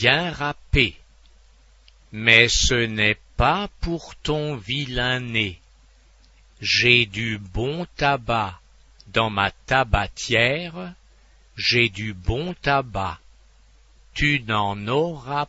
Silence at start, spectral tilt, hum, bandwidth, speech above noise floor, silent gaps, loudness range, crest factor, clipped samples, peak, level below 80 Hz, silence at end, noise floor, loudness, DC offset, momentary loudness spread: 0 s; -4 dB/octave; none; 8 kHz; 31 dB; none; 5 LU; 24 dB; under 0.1%; 0 dBFS; -36 dBFS; 0.05 s; -53 dBFS; -21 LUFS; under 0.1%; 13 LU